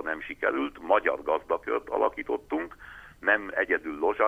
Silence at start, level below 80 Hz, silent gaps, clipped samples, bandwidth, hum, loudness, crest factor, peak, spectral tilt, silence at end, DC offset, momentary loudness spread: 0 s; -58 dBFS; none; under 0.1%; 12.5 kHz; none; -28 LUFS; 20 dB; -8 dBFS; -5.5 dB/octave; 0 s; under 0.1%; 8 LU